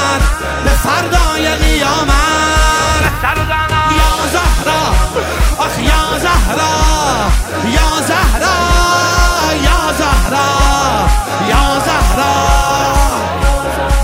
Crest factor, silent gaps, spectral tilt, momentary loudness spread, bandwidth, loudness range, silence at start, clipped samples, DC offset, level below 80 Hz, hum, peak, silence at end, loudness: 12 dB; none; -4 dB/octave; 4 LU; 16.5 kHz; 1 LU; 0 s; under 0.1%; under 0.1%; -16 dBFS; none; 0 dBFS; 0 s; -12 LUFS